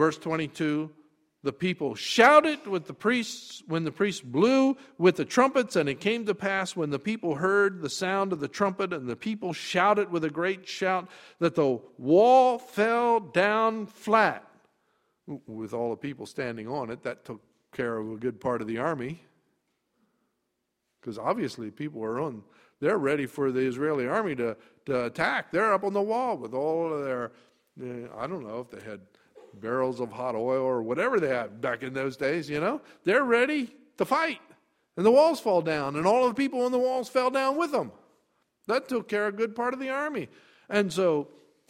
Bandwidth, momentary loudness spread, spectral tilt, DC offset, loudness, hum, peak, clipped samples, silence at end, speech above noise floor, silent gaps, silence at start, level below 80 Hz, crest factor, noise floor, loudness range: 15.5 kHz; 14 LU; -5.5 dB/octave; under 0.1%; -27 LUFS; none; -4 dBFS; under 0.1%; 0.45 s; 53 dB; none; 0 s; -70 dBFS; 22 dB; -80 dBFS; 10 LU